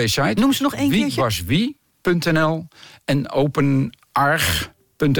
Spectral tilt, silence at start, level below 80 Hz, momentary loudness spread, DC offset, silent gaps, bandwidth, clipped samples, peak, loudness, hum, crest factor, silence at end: -5 dB/octave; 0 s; -42 dBFS; 7 LU; under 0.1%; none; 18 kHz; under 0.1%; -8 dBFS; -20 LUFS; none; 12 dB; 0 s